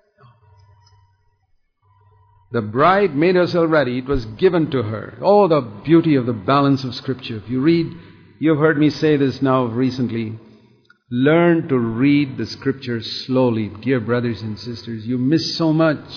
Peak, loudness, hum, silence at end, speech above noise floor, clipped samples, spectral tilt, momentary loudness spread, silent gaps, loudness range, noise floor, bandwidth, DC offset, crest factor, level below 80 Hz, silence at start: -2 dBFS; -18 LUFS; none; 0 s; 45 dB; under 0.1%; -7.5 dB/octave; 12 LU; none; 4 LU; -63 dBFS; 5.4 kHz; under 0.1%; 16 dB; -46 dBFS; 2.5 s